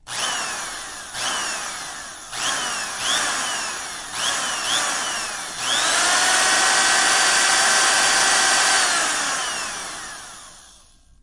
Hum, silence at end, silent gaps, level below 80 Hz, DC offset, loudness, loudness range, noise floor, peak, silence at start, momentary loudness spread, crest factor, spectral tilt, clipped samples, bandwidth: none; 0.55 s; none; -54 dBFS; under 0.1%; -19 LUFS; 8 LU; -51 dBFS; -4 dBFS; 0.05 s; 15 LU; 18 dB; 1.5 dB/octave; under 0.1%; 11.5 kHz